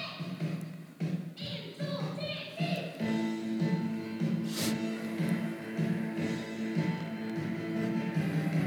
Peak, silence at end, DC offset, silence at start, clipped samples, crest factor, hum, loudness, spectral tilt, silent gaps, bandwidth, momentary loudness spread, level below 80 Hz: -18 dBFS; 0 s; under 0.1%; 0 s; under 0.1%; 14 dB; none; -34 LUFS; -6 dB/octave; none; 19.5 kHz; 6 LU; -76 dBFS